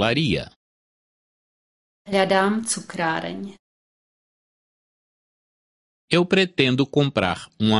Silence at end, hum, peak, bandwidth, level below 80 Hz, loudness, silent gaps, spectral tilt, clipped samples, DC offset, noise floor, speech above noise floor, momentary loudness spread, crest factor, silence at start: 0 s; none; -2 dBFS; 11.5 kHz; -52 dBFS; -21 LUFS; 0.56-2.05 s, 3.59-6.08 s; -4.5 dB/octave; under 0.1%; under 0.1%; under -90 dBFS; over 69 dB; 11 LU; 22 dB; 0 s